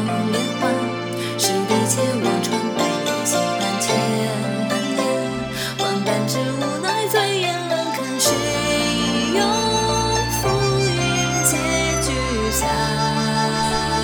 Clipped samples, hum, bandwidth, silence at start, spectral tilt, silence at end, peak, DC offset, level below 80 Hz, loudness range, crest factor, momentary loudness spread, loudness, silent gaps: under 0.1%; none; over 20 kHz; 0 s; -3.5 dB/octave; 0 s; -2 dBFS; under 0.1%; -38 dBFS; 2 LU; 18 dB; 4 LU; -20 LUFS; none